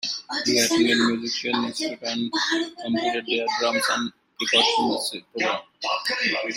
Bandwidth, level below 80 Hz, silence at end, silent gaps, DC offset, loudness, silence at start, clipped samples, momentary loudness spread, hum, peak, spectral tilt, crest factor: 16 kHz; -68 dBFS; 0 s; none; under 0.1%; -23 LUFS; 0 s; under 0.1%; 9 LU; none; -6 dBFS; -2 dB/octave; 18 dB